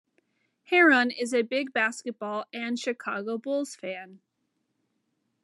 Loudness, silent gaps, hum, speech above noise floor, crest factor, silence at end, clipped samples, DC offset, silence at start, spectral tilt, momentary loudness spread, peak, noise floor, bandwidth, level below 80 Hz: -26 LUFS; none; none; 51 dB; 20 dB; 1.25 s; under 0.1%; under 0.1%; 0.7 s; -3 dB/octave; 15 LU; -10 dBFS; -78 dBFS; 12.5 kHz; under -90 dBFS